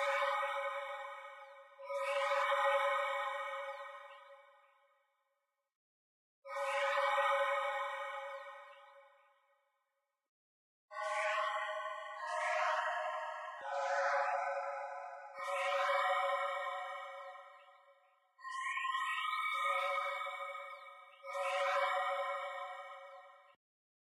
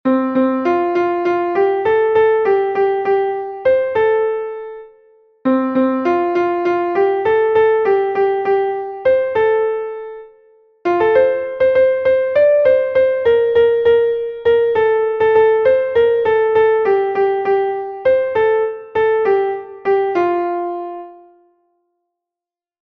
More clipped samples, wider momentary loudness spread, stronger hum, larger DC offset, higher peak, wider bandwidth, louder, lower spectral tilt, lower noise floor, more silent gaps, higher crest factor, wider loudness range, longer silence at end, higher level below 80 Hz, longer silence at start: neither; first, 19 LU vs 8 LU; neither; neither; second, -22 dBFS vs -2 dBFS; first, 13 kHz vs 5.2 kHz; second, -37 LUFS vs -15 LUFS; second, 3 dB/octave vs -7 dB/octave; about the same, -86 dBFS vs -89 dBFS; first, 5.75-6.42 s, 10.29-10.88 s vs none; about the same, 18 dB vs 14 dB; first, 7 LU vs 4 LU; second, 0.6 s vs 1.65 s; second, under -90 dBFS vs -54 dBFS; about the same, 0 s vs 0.05 s